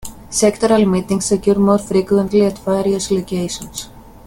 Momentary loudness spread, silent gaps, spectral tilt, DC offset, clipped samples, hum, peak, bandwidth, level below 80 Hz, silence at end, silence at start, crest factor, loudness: 11 LU; none; -5.5 dB/octave; under 0.1%; under 0.1%; none; 0 dBFS; 17 kHz; -42 dBFS; 0.25 s; 0 s; 16 dB; -16 LUFS